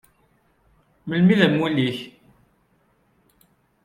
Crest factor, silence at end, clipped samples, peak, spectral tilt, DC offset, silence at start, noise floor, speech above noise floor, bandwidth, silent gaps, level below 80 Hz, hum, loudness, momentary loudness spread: 22 dB; 1.75 s; under 0.1%; -4 dBFS; -7.5 dB/octave; under 0.1%; 1.05 s; -64 dBFS; 45 dB; 10.5 kHz; none; -62 dBFS; none; -20 LUFS; 22 LU